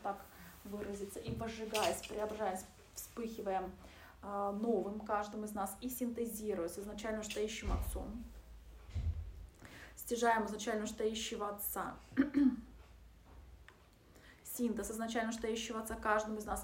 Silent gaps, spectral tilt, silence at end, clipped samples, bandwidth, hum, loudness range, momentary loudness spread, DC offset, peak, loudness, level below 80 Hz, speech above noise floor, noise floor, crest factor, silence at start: none; -4.5 dB/octave; 0 s; under 0.1%; 16 kHz; none; 5 LU; 18 LU; under 0.1%; -20 dBFS; -39 LUFS; -52 dBFS; 24 dB; -63 dBFS; 20 dB; 0 s